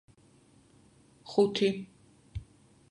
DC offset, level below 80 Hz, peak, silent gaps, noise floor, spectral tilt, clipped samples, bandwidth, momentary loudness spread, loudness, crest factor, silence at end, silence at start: under 0.1%; -56 dBFS; -12 dBFS; none; -62 dBFS; -6 dB/octave; under 0.1%; 11 kHz; 23 LU; -29 LUFS; 22 dB; 0.45 s; 1.25 s